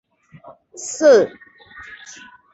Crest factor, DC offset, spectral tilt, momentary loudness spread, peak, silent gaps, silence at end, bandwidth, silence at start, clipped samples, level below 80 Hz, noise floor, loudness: 18 dB; under 0.1%; -3 dB/octave; 26 LU; -2 dBFS; none; 1.25 s; 8.2 kHz; 0.8 s; under 0.1%; -64 dBFS; -45 dBFS; -15 LUFS